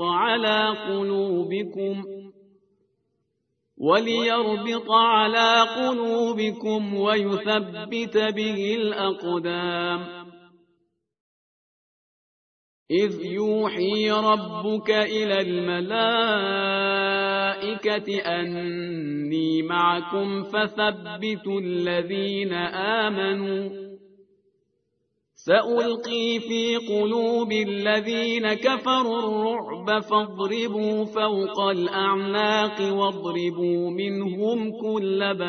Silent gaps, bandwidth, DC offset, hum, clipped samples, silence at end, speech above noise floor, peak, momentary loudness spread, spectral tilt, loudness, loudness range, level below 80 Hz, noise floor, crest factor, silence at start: 11.20-12.86 s; 6.6 kHz; under 0.1%; none; under 0.1%; 0 s; 52 dB; -4 dBFS; 7 LU; -5 dB/octave; -24 LUFS; 7 LU; -70 dBFS; -75 dBFS; 20 dB; 0 s